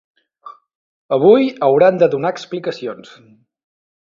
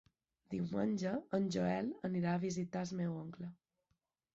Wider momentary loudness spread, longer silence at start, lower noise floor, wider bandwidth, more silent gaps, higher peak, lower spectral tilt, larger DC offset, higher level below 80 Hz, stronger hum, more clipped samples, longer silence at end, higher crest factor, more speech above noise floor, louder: first, 16 LU vs 10 LU; about the same, 0.45 s vs 0.5 s; second, -41 dBFS vs -84 dBFS; about the same, 7.4 kHz vs 7.8 kHz; first, 0.75-1.09 s vs none; first, 0 dBFS vs -24 dBFS; about the same, -7 dB/octave vs -7 dB/octave; neither; first, -64 dBFS vs -72 dBFS; neither; neither; first, 1.1 s vs 0.8 s; about the same, 16 dB vs 16 dB; second, 26 dB vs 46 dB; first, -15 LUFS vs -39 LUFS